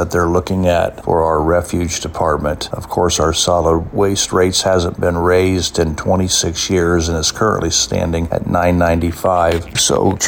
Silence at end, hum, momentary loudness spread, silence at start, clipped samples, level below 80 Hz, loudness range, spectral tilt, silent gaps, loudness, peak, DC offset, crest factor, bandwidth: 0 s; none; 5 LU; 0 s; under 0.1%; -32 dBFS; 1 LU; -4 dB/octave; none; -15 LUFS; -2 dBFS; under 0.1%; 12 dB; 17 kHz